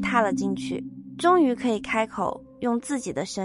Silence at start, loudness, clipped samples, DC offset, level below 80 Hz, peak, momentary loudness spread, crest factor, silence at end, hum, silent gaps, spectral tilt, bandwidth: 0 s; -25 LUFS; under 0.1%; under 0.1%; -56 dBFS; -6 dBFS; 10 LU; 18 dB; 0 s; none; none; -5 dB/octave; 11.5 kHz